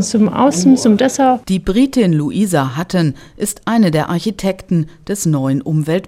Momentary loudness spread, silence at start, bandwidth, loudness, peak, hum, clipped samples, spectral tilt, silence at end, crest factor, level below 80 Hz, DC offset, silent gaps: 8 LU; 0 s; 16 kHz; -15 LUFS; 0 dBFS; none; under 0.1%; -6 dB/octave; 0 s; 14 dB; -40 dBFS; under 0.1%; none